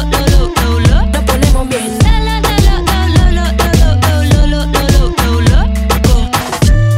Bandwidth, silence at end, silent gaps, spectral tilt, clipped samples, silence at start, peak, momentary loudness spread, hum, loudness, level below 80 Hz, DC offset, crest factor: 16.5 kHz; 0 s; none; -5.5 dB/octave; 0.5%; 0 s; 0 dBFS; 3 LU; none; -11 LUFS; -12 dBFS; under 0.1%; 8 dB